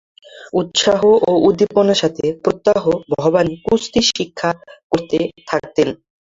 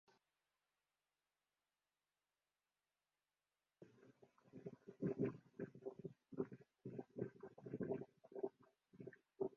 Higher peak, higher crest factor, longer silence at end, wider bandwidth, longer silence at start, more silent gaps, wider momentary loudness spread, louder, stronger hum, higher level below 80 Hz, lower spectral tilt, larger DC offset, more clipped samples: first, -2 dBFS vs -28 dBFS; second, 14 dB vs 24 dB; first, 0.35 s vs 0 s; first, 7.8 kHz vs 6.8 kHz; second, 0.35 s vs 3.8 s; first, 4.83-4.90 s vs none; second, 9 LU vs 14 LU; first, -16 LUFS vs -51 LUFS; second, none vs 50 Hz at -80 dBFS; first, -50 dBFS vs -86 dBFS; second, -4.5 dB/octave vs -9.5 dB/octave; neither; neither